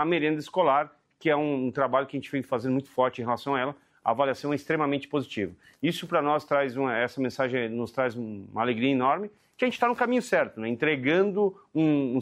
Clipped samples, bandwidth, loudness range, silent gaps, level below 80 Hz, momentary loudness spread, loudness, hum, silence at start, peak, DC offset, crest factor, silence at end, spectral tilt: under 0.1%; 15 kHz; 2 LU; none; -70 dBFS; 7 LU; -27 LUFS; none; 0 s; -10 dBFS; under 0.1%; 18 dB; 0 s; -6.5 dB/octave